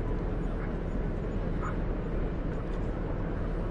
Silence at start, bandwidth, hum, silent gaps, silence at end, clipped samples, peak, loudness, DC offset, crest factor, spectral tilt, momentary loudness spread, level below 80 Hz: 0 s; 7.4 kHz; none; none; 0 s; under 0.1%; -20 dBFS; -34 LUFS; under 0.1%; 12 dB; -9 dB/octave; 1 LU; -34 dBFS